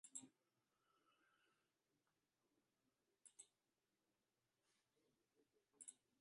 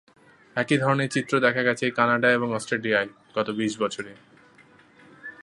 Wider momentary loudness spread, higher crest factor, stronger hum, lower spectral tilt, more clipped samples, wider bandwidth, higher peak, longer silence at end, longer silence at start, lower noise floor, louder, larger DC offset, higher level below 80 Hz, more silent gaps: about the same, 10 LU vs 12 LU; first, 34 dB vs 22 dB; neither; second, -1 dB/octave vs -5 dB/octave; neither; about the same, 11 kHz vs 11.5 kHz; second, -38 dBFS vs -4 dBFS; first, 0.25 s vs 0 s; second, 0.05 s vs 0.55 s; first, under -90 dBFS vs -55 dBFS; second, -63 LUFS vs -24 LUFS; neither; second, under -90 dBFS vs -70 dBFS; neither